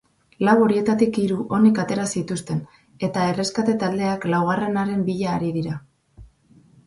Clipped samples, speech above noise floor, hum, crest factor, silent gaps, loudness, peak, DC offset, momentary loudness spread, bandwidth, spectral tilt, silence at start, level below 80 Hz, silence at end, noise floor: under 0.1%; 33 dB; none; 18 dB; none; -21 LUFS; -4 dBFS; under 0.1%; 10 LU; 11.5 kHz; -6 dB/octave; 0.4 s; -56 dBFS; 0.6 s; -54 dBFS